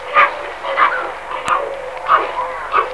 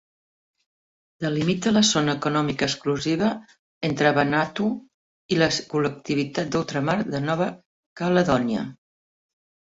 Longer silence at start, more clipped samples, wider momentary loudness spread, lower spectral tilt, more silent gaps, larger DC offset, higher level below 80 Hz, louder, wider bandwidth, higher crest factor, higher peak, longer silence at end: second, 0 s vs 1.2 s; neither; about the same, 11 LU vs 9 LU; second, -2.5 dB/octave vs -4.5 dB/octave; second, none vs 3.59-3.81 s, 4.94-5.29 s, 7.66-7.96 s; first, 0.7% vs under 0.1%; first, -50 dBFS vs -56 dBFS; first, -17 LUFS vs -23 LUFS; first, 11 kHz vs 8 kHz; about the same, 18 dB vs 18 dB; first, 0 dBFS vs -6 dBFS; second, 0 s vs 1 s